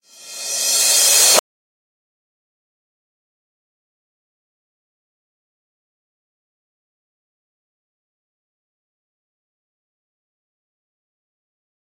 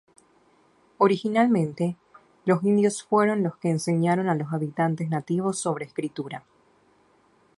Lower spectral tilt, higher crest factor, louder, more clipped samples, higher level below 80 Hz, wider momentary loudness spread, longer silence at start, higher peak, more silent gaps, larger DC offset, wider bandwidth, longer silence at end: second, 2.5 dB/octave vs -6.5 dB/octave; first, 26 dB vs 20 dB; first, -12 LUFS vs -25 LUFS; neither; second, under -90 dBFS vs -70 dBFS; first, 13 LU vs 10 LU; second, 0.25 s vs 1 s; first, 0 dBFS vs -6 dBFS; neither; neither; first, 16.5 kHz vs 11.5 kHz; first, 10.6 s vs 1.2 s